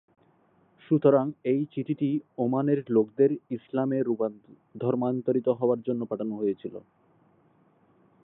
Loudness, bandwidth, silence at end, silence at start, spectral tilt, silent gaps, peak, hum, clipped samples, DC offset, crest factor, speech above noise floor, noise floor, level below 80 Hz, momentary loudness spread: -27 LUFS; 4 kHz; 1.45 s; 0.9 s; -12.5 dB/octave; none; -8 dBFS; none; under 0.1%; under 0.1%; 20 dB; 37 dB; -64 dBFS; -78 dBFS; 10 LU